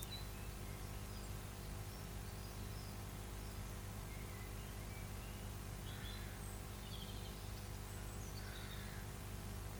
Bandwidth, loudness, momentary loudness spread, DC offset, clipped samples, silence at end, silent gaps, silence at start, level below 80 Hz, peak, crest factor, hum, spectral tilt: over 20 kHz; -49 LUFS; 1 LU; under 0.1%; under 0.1%; 0 s; none; 0 s; -52 dBFS; -26 dBFS; 22 dB; 50 Hz at -50 dBFS; -4.5 dB/octave